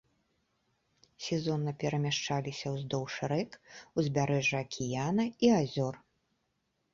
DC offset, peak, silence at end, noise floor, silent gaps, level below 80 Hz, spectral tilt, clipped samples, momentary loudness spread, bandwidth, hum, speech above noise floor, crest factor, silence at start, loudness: under 0.1%; -14 dBFS; 0.95 s; -79 dBFS; none; -66 dBFS; -5.5 dB/octave; under 0.1%; 10 LU; 7.6 kHz; none; 47 dB; 20 dB; 1.2 s; -32 LUFS